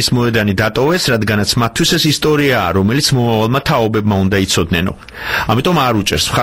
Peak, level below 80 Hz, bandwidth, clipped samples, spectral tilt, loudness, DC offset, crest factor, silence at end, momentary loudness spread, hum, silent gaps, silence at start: -2 dBFS; -36 dBFS; 16.5 kHz; under 0.1%; -4.5 dB/octave; -13 LUFS; 0.2%; 12 dB; 0 s; 3 LU; none; none; 0 s